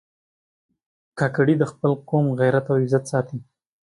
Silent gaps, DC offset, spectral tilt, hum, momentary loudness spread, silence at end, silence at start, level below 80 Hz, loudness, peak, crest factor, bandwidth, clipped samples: none; under 0.1%; -8 dB/octave; none; 10 LU; 0.45 s; 1.15 s; -64 dBFS; -21 LUFS; -6 dBFS; 16 dB; 11.5 kHz; under 0.1%